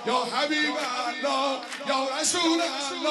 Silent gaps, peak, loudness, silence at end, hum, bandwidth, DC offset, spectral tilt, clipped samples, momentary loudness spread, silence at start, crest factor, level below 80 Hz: none; -10 dBFS; -26 LUFS; 0 s; none; 12.5 kHz; under 0.1%; -1 dB/octave; under 0.1%; 5 LU; 0 s; 16 dB; -76 dBFS